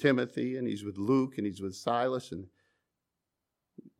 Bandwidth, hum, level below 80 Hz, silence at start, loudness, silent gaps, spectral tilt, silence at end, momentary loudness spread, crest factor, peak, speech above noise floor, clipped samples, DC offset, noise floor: 12.5 kHz; none; -76 dBFS; 0 s; -32 LUFS; none; -6.5 dB/octave; 0.1 s; 8 LU; 20 dB; -12 dBFS; 55 dB; under 0.1%; under 0.1%; -86 dBFS